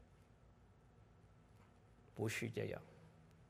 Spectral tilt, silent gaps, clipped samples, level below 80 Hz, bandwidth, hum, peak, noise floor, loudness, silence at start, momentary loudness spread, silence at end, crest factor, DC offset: -5 dB/octave; none; under 0.1%; -74 dBFS; 14 kHz; none; -30 dBFS; -67 dBFS; -46 LUFS; 0 s; 25 LU; 0 s; 22 dB; under 0.1%